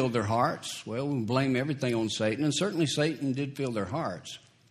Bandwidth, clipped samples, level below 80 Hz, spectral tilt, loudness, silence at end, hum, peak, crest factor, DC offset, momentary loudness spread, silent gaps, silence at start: 14 kHz; under 0.1%; -66 dBFS; -5 dB/octave; -29 LUFS; 0.35 s; none; -12 dBFS; 18 dB; under 0.1%; 8 LU; none; 0 s